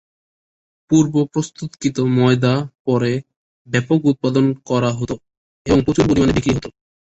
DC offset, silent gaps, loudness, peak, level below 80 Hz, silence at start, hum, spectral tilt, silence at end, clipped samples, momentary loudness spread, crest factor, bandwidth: under 0.1%; 2.79-2.85 s, 3.36-3.65 s, 5.37-5.65 s; -18 LUFS; -2 dBFS; -40 dBFS; 0.9 s; none; -6.5 dB/octave; 0.35 s; under 0.1%; 11 LU; 16 dB; 8.2 kHz